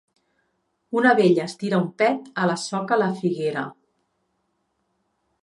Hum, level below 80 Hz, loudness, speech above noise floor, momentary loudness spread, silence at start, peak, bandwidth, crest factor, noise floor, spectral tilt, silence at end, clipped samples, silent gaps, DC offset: none; -74 dBFS; -22 LUFS; 51 dB; 10 LU; 0.9 s; -4 dBFS; 11.5 kHz; 20 dB; -73 dBFS; -6 dB/octave; 1.7 s; under 0.1%; none; under 0.1%